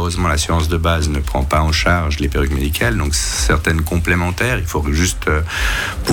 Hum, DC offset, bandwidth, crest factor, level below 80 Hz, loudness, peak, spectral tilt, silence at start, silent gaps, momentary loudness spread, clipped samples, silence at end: none; under 0.1%; 18.5 kHz; 12 dB; -22 dBFS; -17 LUFS; -4 dBFS; -4.5 dB/octave; 0 s; none; 3 LU; under 0.1%; 0 s